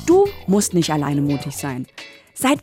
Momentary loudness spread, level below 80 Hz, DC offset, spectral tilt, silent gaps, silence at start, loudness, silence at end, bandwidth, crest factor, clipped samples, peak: 18 LU; -48 dBFS; under 0.1%; -5 dB/octave; none; 0 s; -19 LUFS; 0 s; 17 kHz; 14 dB; under 0.1%; -4 dBFS